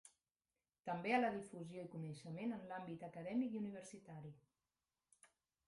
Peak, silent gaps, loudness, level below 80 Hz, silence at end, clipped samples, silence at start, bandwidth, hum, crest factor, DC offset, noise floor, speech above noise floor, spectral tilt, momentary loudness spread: -24 dBFS; 0.79-0.83 s; -45 LUFS; -84 dBFS; 0.4 s; under 0.1%; 0.05 s; 11.5 kHz; none; 22 dB; under 0.1%; under -90 dBFS; over 45 dB; -6.5 dB/octave; 17 LU